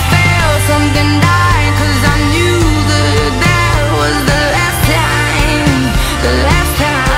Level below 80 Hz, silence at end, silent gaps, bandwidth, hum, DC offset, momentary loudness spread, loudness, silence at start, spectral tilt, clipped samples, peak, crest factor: -18 dBFS; 0 s; none; 16.5 kHz; none; under 0.1%; 2 LU; -11 LUFS; 0 s; -4.5 dB/octave; under 0.1%; 0 dBFS; 10 dB